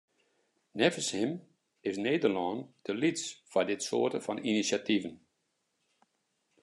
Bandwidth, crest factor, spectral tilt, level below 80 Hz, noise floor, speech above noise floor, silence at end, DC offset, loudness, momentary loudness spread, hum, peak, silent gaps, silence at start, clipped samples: 12 kHz; 24 dB; -4 dB/octave; -82 dBFS; -80 dBFS; 48 dB; 1.45 s; under 0.1%; -32 LUFS; 10 LU; none; -10 dBFS; none; 0.75 s; under 0.1%